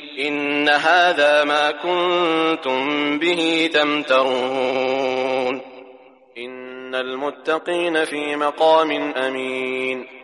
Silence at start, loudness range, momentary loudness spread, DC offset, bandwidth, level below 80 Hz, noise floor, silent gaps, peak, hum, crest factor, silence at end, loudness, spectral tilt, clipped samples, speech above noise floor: 0 s; 7 LU; 10 LU; under 0.1%; 11.5 kHz; -74 dBFS; -46 dBFS; none; -4 dBFS; none; 16 dB; 0 s; -19 LUFS; -3.5 dB/octave; under 0.1%; 27 dB